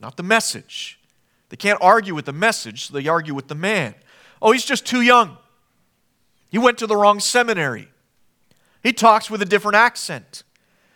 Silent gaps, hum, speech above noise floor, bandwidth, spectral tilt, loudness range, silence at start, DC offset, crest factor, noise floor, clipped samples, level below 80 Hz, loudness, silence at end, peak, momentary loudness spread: none; none; 47 dB; 19 kHz; -3 dB/octave; 3 LU; 0 s; under 0.1%; 20 dB; -65 dBFS; under 0.1%; -68 dBFS; -18 LUFS; 0.55 s; 0 dBFS; 15 LU